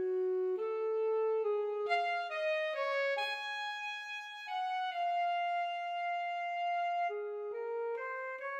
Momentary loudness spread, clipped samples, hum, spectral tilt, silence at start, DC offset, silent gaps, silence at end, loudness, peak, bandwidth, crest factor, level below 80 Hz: 7 LU; under 0.1%; none; -1 dB/octave; 0 s; under 0.1%; none; 0 s; -36 LUFS; -22 dBFS; 8.8 kHz; 14 dB; under -90 dBFS